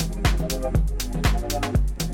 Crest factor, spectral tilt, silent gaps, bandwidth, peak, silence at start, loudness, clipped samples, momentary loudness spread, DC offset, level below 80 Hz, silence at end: 18 dB; -5 dB/octave; none; 17 kHz; -6 dBFS; 0 s; -25 LUFS; under 0.1%; 2 LU; under 0.1%; -24 dBFS; 0 s